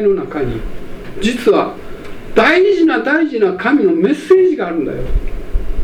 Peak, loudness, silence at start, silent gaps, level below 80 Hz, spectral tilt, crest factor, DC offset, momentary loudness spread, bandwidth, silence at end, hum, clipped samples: 0 dBFS; -14 LUFS; 0 s; none; -26 dBFS; -6 dB/octave; 14 dB; under 0.1%; 18 LU; 11.5 kHz; 0 s; none; under 0.1%